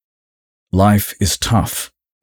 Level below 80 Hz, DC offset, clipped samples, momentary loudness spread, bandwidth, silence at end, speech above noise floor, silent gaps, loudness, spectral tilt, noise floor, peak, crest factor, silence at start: -36 dBFS; under 0.1%; under 0.1%; 10 LU; over 20 kHz; 0.35 s; over 75 dB; none; -16 LUFS; -5 dB/octave; under -90 dBFS; -4 dBFS; 14 dB; 0.75 s